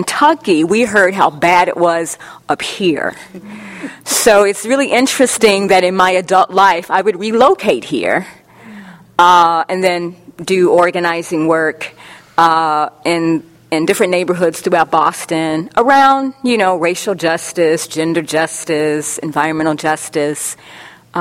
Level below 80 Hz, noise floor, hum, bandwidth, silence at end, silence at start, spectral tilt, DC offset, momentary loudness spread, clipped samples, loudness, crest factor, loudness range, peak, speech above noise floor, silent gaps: -54 dBFS; -35 dBFS; none; 16.5 kHz; 0 s; 0 s; -3.5 dB/octave; under 0.1%; 11 LU; 0.1%; -13 LUFS; 14 dB; 4 LU; 0 dBFS; 22 dB; none